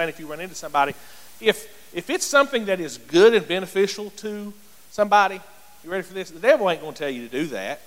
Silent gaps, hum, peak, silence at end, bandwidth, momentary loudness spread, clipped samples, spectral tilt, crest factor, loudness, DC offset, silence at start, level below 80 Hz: none; none; -2 dBFS; 0.1 s; 16.5 kHz; 17 LU; under 0.1%; -3.5 dB/octave; 20 dB; -22 LUFS; 0.4%; 0 s; -62 dBFS